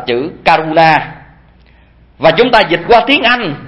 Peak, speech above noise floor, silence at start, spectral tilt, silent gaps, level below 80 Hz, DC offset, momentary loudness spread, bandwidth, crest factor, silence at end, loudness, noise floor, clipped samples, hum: 0 dBFS; 34 dB; 0 s; -6 dB/octave; none; -40 dBFS; under 0.1%; 6 LU; 11 kHz; 12 dB; 0 s; -10 LUFS; -44 dBFS; 0.3%; none